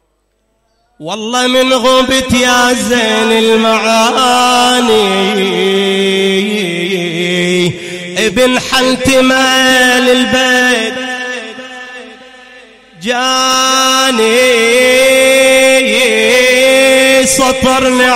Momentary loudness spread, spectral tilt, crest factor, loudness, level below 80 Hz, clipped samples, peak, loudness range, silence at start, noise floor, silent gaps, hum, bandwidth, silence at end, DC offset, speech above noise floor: 11 LU; -2.5 dB/octave; 10 dB; -9 LUFS; -40 dBFS; under 0.1%; 0 dBFS; 5 LU; 1 s; -60 dBFS; none; none; 16.5 kHz; 0 s; under 0.1%; 50 dB